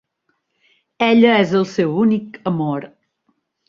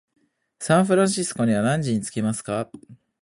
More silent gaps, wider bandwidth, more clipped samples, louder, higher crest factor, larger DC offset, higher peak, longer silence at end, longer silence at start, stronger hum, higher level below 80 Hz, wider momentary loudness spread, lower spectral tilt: neither; second, 7.2 kHz vs 11.5 kHz; neither; first, -17 LUFS vs -22 LUFS; about the same, 16 dB vs 16 dB; neither; first, -2 dBFS vs -6 dBFS; first, 0.8 s vs 0.3 s; first, 1 s vs 0.6 s; neither; about the same, -60 dBFS vs -58 dBFS; about the same, 11 LU vs 11 LU; first, -7 dB/octave vs -5.5 dB/octave